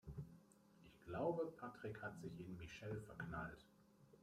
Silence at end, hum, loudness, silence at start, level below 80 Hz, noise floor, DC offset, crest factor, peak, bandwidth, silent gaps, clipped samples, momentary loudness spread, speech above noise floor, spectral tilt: 0.05 s; none; -50 LUFS; 0.05 s; -70 dBFS; -69 dBFS; under 0.1%; 22 dB; -30 dBFS; 15.5 kHz; none; under 0.1%; 20 LU; 19 dB; -7 dB/octave